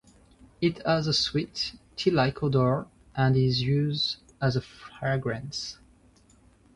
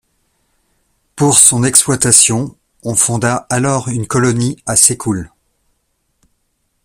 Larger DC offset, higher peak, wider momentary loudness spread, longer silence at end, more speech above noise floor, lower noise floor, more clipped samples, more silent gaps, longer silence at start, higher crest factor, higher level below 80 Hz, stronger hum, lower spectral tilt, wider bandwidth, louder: neither; second, -10 dBFS vs 0 dBFS; second, 10 LU vs 13 LU; second, 1 s vs 1.6 s; second, 33 dB vs 53 dB; second, -59 dBFS vs -65 dBFS; second, under 0.1% vs 0.2%; neither; second, 0.6 s vs 1.15 s; about the same, 18 dB vs 16 dB; second, -54 dBFS vs -46 dBFS; neither; first, -6 dB/octave vs -3.5 dB/octave; second, 11 kHz vs over 20 kHz; second, -27 LUFS vs -11 LUFS